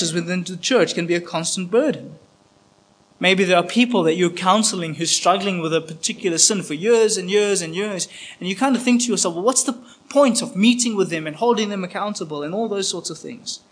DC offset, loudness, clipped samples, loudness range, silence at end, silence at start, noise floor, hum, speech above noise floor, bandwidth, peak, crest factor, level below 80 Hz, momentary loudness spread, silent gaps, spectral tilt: under 0.1%; -19 LUFS; under 0.1%; 3 LU; 0.15 s; 0 s; -56 dBFS; none; 36 dB; 10.5 kHz; 0 dBFS; 20 dB; -72 dBFS; 10 LU; none; -3 dB/octave